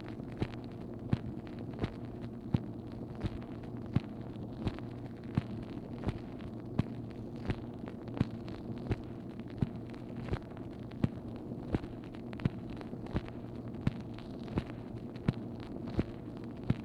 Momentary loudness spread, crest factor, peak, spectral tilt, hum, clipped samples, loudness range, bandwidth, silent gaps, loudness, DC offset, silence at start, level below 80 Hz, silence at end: 7 LU; 26 dB; -14 dBFS; -9 dB/octave; none; under 0.1%; 1 LU; 10.5 kHz; none; -40 LUFS; under 0.1%; 0 s; -52 dBFS; 0 s